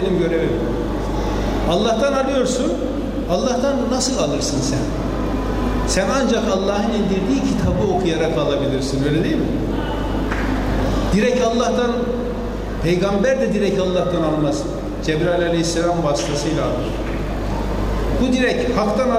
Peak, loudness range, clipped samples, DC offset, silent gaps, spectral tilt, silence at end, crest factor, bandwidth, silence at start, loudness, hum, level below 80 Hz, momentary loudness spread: -6 dBFS; 2 LU; under 0.1%; under 0.1%; none; -5.5 dB/octave; 0 s; 12 dB; 15 kHz; 0 s; -19 LUFS; none; -28 dBFS; 5 LU